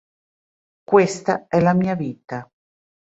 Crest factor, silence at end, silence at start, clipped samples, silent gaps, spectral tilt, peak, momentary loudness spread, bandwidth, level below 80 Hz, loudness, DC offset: 20 dB; 0.65 s; 0.9 s; under 0.1%; none; -7 dB/octave; -2 dBFS; 16 LU; 8 kHz; -58 dBFS; -19 LUFS; under 0.1%